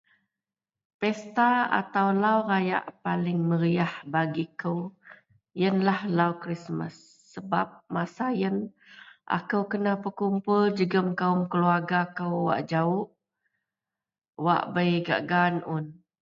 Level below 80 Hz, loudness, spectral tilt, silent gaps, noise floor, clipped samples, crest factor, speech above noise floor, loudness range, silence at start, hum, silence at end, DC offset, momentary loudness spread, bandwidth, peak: -72 dBFS; -27 LUFS; -8 dB/octave; 14.29-14.33 s; under -90 dBFS; under 0.1%; 20 dB; over 64 dB; 4 LU; 1 s; none; 0.3 s; under 0.1%; 10 LU; 7.6 kHz; -8 dBFS